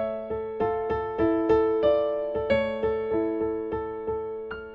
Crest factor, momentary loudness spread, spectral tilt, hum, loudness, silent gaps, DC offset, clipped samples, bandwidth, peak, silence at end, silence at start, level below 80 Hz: 16 dB; 9 LU; -8.5 dB/octave; none; -27 LUFS; none; under 0.1%; under 0.1%; 5.4 kHz; -10 dBFS; 0 s; 0 s; -48 dBFS